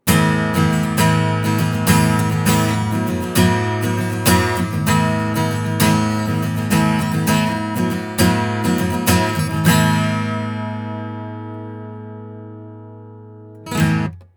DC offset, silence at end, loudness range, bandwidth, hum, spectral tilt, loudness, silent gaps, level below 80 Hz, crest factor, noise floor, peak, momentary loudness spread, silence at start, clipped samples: under 0.1%; 0.15 s; 9 LU; over 20 kHz; none; -5.5 dB/octave; -17 LUFS; none; -42 dBFS; 16 dB; -38 dBFS; 0 dBFS; 16 LU; 0.05 s; under 0.1%